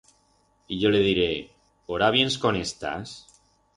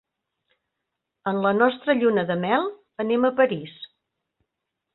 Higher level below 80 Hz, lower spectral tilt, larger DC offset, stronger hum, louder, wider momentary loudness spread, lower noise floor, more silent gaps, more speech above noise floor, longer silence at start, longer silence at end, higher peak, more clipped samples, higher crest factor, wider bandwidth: first, -52 dBFS vs -68 dBFS; second, -4.5 dB/octave vs -10.5 dB/octave; neither; neither; about the same, -24 LUFS vs -23 LUFS; about the same, 15 LU vs 13 LU; second, -65 dBFS vs -82 dBFS; neither; second, 41 dB vs 60 dB; second, 0.7 s vs 1.25 s; second, 0.55 s vs 1.1 s; about the same, -6 dBFS vs -4 dBFS; neither; about the same, 20 dB vs 20 dB; first, 11.5 kHz vs 4.2 kHz